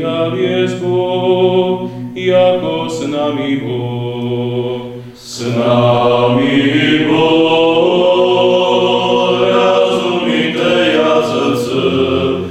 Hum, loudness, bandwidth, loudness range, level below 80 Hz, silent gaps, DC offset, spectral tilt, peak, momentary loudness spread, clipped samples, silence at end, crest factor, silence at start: none; -13 LUFS; 14 kHz; 5 LU; -52 dBFS; none; under 0.1%; -6 dB/octave; 0 dBFS; 8 LU; under 0.1%; 0 s; 12 dB; 0 s